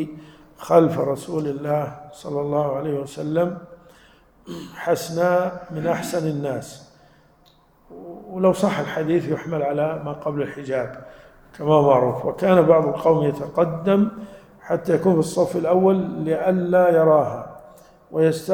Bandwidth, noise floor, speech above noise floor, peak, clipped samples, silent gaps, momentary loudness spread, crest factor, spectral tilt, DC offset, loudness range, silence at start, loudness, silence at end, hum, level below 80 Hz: 19 kHz; -56 dBFS; 35 dB; -2 dBFS; under 0.1%; none; 17 LU; 20 dB; -7 dB/octave; under 0.1%; 7 LU; 0 s; -21 LUFS; 0 s; none; -56 dBFS